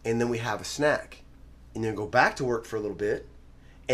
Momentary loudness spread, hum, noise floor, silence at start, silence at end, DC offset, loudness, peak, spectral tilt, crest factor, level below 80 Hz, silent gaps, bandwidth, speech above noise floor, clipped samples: 12 LU; none; -50 dBFS; 0.05 s; 0 s; under 0.1%; -28 LUFS; -6 dBFS; -5 dB/octave; 24 dB; -52 dBFS; none; 15 kHz; 23 dB; under 0.1%